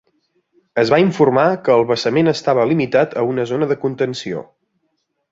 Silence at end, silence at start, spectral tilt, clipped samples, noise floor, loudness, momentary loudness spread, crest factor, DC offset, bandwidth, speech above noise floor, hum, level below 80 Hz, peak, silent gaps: 0.9 s; 0.75 s; -6.5 dB/octave; under 0.1%; -70 dBFS; -16 LUFS; 9 LU; 16 dB; under 0.1%; 7.8 kHz; 54 dB; none; -58 dBFS; -2 dBFS; none